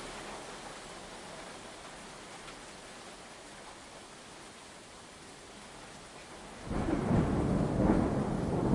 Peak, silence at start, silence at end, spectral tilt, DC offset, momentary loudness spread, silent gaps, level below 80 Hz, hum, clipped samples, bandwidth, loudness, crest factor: -14 dBFS; 0 s; 0 s; -6.5 dB/octave; under 0.1%; 19 LU; none; -48 dBFS; none; under 0.1%; 11.5 kHz; -35 LUFS; 22 dB